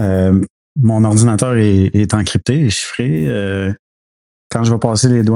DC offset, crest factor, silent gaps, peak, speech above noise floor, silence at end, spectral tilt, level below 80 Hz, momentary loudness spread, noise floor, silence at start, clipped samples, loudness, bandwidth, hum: under 0.1%; 14 dB; 0.50-0.75 s, 3.79-4.50 s; 0 dBFS; over 77 dB; 0 s; -6 dB/octave; -42 dBFS; 8 LU; under -90 dBFS; 0 s; under 0.1%; -14 LUFS; 11.5 kHz; none